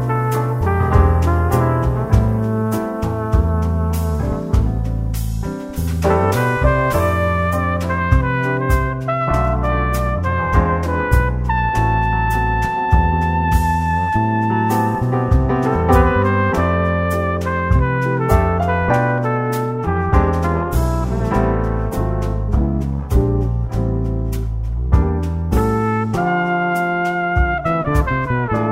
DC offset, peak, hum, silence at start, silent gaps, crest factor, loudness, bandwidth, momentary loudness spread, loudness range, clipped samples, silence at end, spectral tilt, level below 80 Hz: under 0.1%; 0 dBFS; none; 0 s; none; 16 dB; -18 LUFS; 16 kHz; 5 LU; 3 LU; under 0.1%; 0 s; -7.5 dB/octave; -22 dBFS